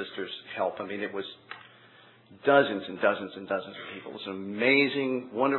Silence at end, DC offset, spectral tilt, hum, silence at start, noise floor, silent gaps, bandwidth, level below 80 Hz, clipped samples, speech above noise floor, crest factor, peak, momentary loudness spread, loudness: 0 s; under 0.1%; -8 dB/octave; none; 0 s; -56 dBFS; none; 4.3 kHz; -82 dBFS; under 0.1%; 27 dB; 22 dB; -8 dBFS; 17 LU; -28 LUFS